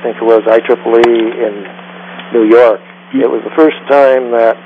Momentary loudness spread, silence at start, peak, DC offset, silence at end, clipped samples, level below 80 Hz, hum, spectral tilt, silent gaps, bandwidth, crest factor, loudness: 17 LU; 0 s; 0 dBFS; under 0.1%; 0.05 s; 0.5%; -58 dBFS; none; -6.5 dB/octave; none; 7.6 kHz; 10 dB; -10 LUFS